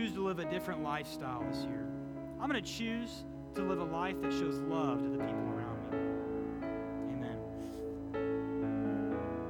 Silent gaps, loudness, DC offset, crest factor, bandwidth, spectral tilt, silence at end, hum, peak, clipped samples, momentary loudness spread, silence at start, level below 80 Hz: none; -38 LUFS; under 0.1%; 16 dB; 18.5 kHz; -6.5 dB/octave; 0 s; none; -20 dBFS; under 0.1%; 7 LU; 0 s; -60 dBFS